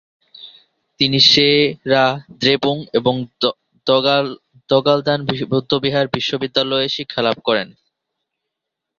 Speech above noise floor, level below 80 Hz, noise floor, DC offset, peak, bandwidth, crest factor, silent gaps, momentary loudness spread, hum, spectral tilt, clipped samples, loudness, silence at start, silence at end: 64 dB; -56 dBFS; -81 dBFS; under 0.1%; 0 dBFS; 7.4 kHz; 18 dB; none; 9 LU; none; -5 dB/octave; under 0.1%; -16 LUFS; 0.4 s; 1.3 s